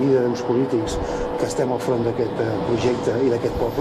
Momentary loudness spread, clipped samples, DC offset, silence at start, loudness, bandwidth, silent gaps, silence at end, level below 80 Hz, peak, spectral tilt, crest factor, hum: 4 LU; under 0.1%; under 0.1%; 0 s; -22 LUFS; 13.5 kHz; none; 0 s; -38 dBFS; -8 dBFS; -6.5 dB/octave; 14 dB; none